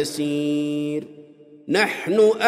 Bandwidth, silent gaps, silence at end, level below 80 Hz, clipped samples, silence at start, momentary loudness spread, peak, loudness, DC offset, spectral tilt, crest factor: 15.5 kHz; none; 0 s; -70 dBFS; under 0.1%; 0 s; 15 LU; -2 dBFS; -22 LUFS; under 0.1%; -4.5 dB/octave; 18 dB